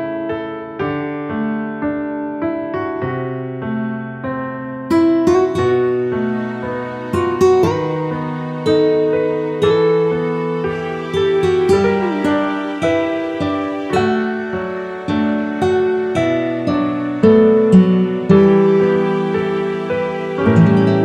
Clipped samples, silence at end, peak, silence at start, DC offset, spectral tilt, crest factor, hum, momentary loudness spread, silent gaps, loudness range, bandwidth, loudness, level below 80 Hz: under 0.1%; 0 s; 0 dBFS; 0 s; under 0.1%; -7.5 dB/octave; 16 dB; none; 12 LU; none; 9 LU; 11 kHz; -17 LUFS; -48 dBFS